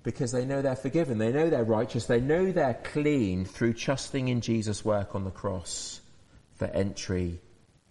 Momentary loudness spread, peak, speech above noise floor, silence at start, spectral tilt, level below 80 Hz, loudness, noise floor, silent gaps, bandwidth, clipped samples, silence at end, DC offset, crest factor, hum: 9 LU; -14 dBFS; 29 dB; 0.05 s; -6 dB/octave; -54 dBFS; -29 LUFS; -57 dBFS; none; 11.5 kHz; under 0.1%; 0.5 s; under 0.1%; 16 dB; none